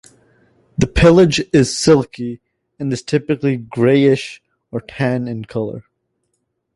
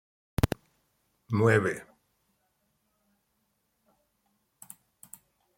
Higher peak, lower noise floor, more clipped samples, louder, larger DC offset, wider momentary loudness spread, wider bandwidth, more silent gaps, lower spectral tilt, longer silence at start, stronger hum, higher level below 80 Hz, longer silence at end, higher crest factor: first, 0 dBFS vs -8 dBFS; second, -71 dBFS vs -76 dBFS; neither; first, -16 LUFS vs -28 LUFS; neither; second, 17 LU vs 26 LU; second, 11.5 kHz vs 16.5 kHz; neither; about the same, -6 dB/octave vs -6.5 dB/octave; first, 0.8 s vs 0.45 s; neither; first, -36 dBFS vs -50 dBFS; second, 0.95 s vs 3.75 s; second, 16 dB vs 26 dB